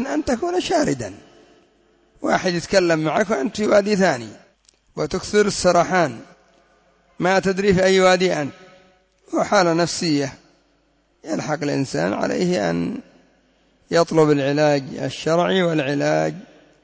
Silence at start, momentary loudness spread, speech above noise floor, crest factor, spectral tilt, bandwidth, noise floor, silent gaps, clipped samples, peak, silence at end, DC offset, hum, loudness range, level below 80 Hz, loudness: 0 s; 12 LU; 43 dB; 16 dB; -5 dB/octave; 8 kHz; -62 dBFS; none; under 0.1%; -4 dBFS; 0.4 s; under 0.1%; none; 4 LU; -50 dBFS; -20 LUFS